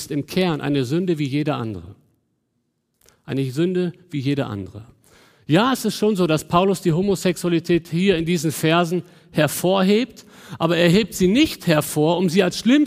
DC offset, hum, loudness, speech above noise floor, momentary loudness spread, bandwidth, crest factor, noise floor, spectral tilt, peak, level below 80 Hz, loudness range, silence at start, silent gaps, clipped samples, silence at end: under 0.1%; none; -20 LUFS; 52 dB; 10 LU; 16 kHz; 18 dB; -72 dBFS; -5.5 dB/octave; -2 dBFS; -50 dBFS; 8 LU; 0 s; none; under 0.1%; 0 s